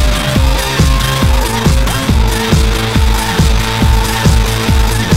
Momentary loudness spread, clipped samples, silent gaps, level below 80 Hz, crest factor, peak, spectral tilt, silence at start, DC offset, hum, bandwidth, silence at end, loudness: 1 LU; 0.2%; none; -14 dBFS; 10 dB; 0 dBFS; -4.5 dB/octave; 0 s; under 0.1%; none; 16.5 kHz; 0 s; -12 LUFS